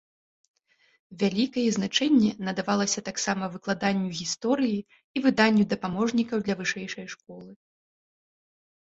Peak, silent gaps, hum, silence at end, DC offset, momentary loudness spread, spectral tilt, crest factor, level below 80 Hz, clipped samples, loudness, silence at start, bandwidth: -6 dBFS; 5.04-5.14 s; none; 1.25 s; under 0.1%; 13 LU; -4 dB/octave; 22 dB; -66 dBFS; under 0.1%; -26 LUFS; 1.1 s; 8 kHz